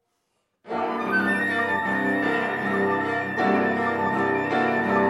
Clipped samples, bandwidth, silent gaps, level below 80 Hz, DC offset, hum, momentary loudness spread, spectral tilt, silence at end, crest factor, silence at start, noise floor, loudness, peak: under 0.1%; 13.5 kHz; none; -66 dBFS; under 0.1%; none; 3 LU; -6.5 dB/octave; 0 s; 14 dB; 0.65 s; -74 dBFS; -23 LUFS; -10 dBFS